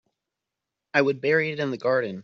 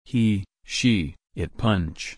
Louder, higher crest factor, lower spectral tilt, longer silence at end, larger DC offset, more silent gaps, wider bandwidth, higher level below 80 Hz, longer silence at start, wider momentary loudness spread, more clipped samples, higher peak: about the same, -24 LUFS vs -25 LUFS; about the same, 20 dB vs 16 dB; second, -4 dB/octave vs -5.5 dB/octave; about the same, 0 s vs 0.05 s; neither; neither; second, 7 kHz vs 10.5 kHz; second, -72 dBFS vs -42 dBFS; first, 0.95 s vs 0.1 s; second, 5 LU vs 11 LU; neither; about the same, -6 dBFS vs -8 dBFS